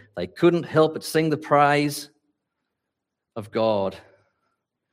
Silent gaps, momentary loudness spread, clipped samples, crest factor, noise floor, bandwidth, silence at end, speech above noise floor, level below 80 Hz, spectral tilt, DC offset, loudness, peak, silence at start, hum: none; 16 LU; under 0.1%; 18 dB; -82 dBFS; 16 kHz; 0.9 s; 61 dB; -70 dBFS; -6 dB/octave; under 0.1%; -22 LUFS; -6 dBFS; 0.15 s; none